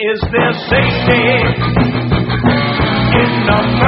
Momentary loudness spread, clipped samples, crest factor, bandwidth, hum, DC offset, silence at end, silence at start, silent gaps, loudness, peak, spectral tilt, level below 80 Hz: 3 LU; under 0.1%; 12 dB; 5.8 kHz; none; under 0.1%; 0 s; 0 s; none; -13 LUFS; 0 dBFS; -4.5 dB/octave; -28 dBFS